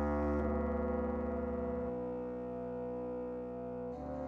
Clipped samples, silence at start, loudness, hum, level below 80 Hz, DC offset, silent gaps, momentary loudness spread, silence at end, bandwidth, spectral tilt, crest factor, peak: under 0.1%; 0 s; -38 LUFS; none; -48 dBFS; under 0.1%; none; 8 LU; 0 s; 6 kHz; -10.5 dB/octave; 12 dB; -24 dBFS